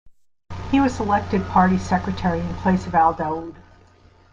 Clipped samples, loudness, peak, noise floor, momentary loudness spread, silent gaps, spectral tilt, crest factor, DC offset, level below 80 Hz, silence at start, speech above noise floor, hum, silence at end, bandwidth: under 0.1%; -21 LUFS; -4 dBFS; -52 dBFS; 12 LU; none; -7 dB/octave; 18 dB; under 0.1%; -40 dBFS; 0.05 s; 32 dB; none; 0.75 s; 7.6 kHz